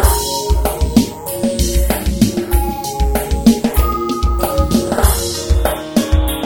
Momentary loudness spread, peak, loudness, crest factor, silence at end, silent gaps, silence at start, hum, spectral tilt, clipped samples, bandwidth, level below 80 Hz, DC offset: 4 LU; 0 dBFS; -16 LUFS; 14 dB; 0 s; none; 0 s; none; -5 dB/octave; 0.1%; over 20 kHz; -18 dBFS; under 0.1%